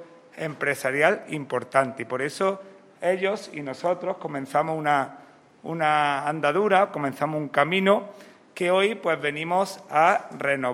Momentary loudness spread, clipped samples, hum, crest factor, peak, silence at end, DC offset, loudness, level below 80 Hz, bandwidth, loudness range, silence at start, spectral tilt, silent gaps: 11 LU; under 0.1%; none; 20 dB; -4 dBFS; 0 s; under 0.1%; -24 LUFS; -76 dBFS; 16 kHz; 4 LU; 0 s; -5 dB/octave; none